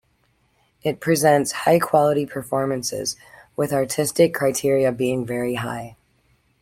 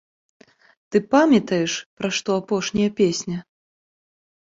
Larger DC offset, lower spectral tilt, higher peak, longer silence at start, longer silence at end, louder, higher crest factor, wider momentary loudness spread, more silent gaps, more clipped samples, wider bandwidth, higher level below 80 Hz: neither; about the same, -4.5 dB/octave vs -4.5 dB/octave; about the same, -4 dBFS vs -4 dBFS; about the same, 0.85 s vs 0.9 s; second, 0.7 s vs 1.1 s; about the same, -21 LUFS vs -21 LUFS; about the same, 18 dB vs 20 dB; about the same, 11 LU vs 10 LU; second, none vs 1.86-1.97 s; neither; first, 16.5 kHz vs 7.8 kHz; about the same, -58 dBFS vs -60 dBFS